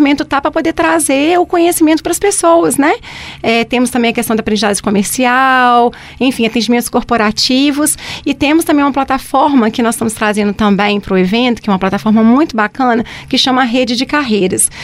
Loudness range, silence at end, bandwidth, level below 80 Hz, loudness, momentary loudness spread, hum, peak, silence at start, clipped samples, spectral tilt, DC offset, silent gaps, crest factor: 1 LU; 0 s; 16 kHz; -40 dBFS; -11 LUFS; 5 LU; none; 0 dBFS; 0 s; under 0.1%; -3.5 dB/octave; under 0.1%; none; 12 dB